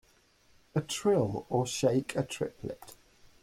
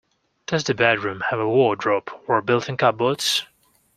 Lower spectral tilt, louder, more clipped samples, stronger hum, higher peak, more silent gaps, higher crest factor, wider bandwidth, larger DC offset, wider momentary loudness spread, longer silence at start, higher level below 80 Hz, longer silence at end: first, -5.5 dB/octave vs -4 dB/octave; second, -31 LUFS vs -21 LUFS; neither; neither; second, -14 dBFS vs 0 dBFS; neither; about the same, 18 dB vs 22 dB; about the same, 16.5 kHz vs 15.5 kHz; neither; first, 14 LU vs 6 LU; first, 0.75 s vs 0.5 s; about the same, -62 dBFS vs -62 dBFS; about the same, 0.5 s vs 0.5 s